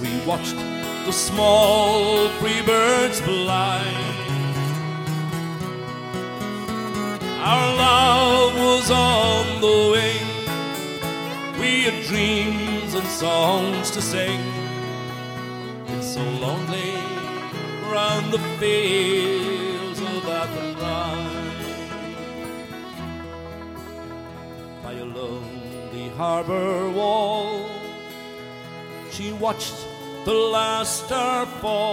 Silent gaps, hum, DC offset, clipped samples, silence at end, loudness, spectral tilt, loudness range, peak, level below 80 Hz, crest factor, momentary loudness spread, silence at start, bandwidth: none; none; under 0.1%; under 0.1%; 0 s; -22 LUFS; -4 dB/octave; 12 LU; -4 dBFS; -48 dBFS; 20 dB; 17 LU; 0 s; 17 kHz